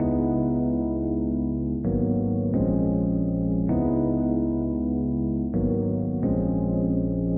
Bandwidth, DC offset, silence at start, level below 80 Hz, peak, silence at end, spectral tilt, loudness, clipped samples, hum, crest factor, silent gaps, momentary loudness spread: 2.4 kHz; under 0.1%; 0 s; -36 dBFS; -12 dBFS; 0 s; -15.5 dB/octave; -25 LUFS; under 0.1%; none; 12 dB; none; 3 LU